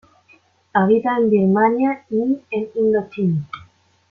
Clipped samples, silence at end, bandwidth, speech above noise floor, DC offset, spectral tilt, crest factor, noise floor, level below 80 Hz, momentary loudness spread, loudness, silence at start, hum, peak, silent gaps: under 0.1%; 0.5 s; 4.8 kHz; 37 dB; under 0.1%; -10 dB/octave; 16 dB; -55 dBFS; -60 dBFS; 9 LU; -19 LUFS; 0.75 s; none; -2 dBFS; none